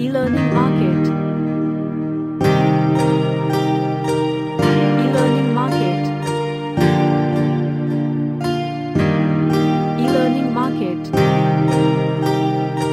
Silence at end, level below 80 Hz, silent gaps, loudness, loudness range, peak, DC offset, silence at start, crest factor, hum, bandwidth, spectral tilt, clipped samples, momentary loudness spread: 0 s; -50 dBFS; none; -18 LUFS; 2 LU; -2 dBFS; under 0.1%; 0 s; 14 dB; none; 13.5 kHz; -7.5 dB/octave; under 0.1%; 6 LU